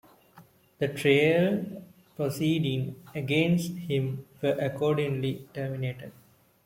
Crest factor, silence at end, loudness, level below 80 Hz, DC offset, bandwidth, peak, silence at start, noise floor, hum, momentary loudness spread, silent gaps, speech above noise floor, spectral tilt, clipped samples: 20 dB; 0.55 s; -28 LUFS; -64 dBFS; under 0.1%; 16.5 kHz; -10 dBFS; 0.35 s; -57 dBFS; none; 13 LU; none; 29 dB; -6.5 dB/octave; under 0.1%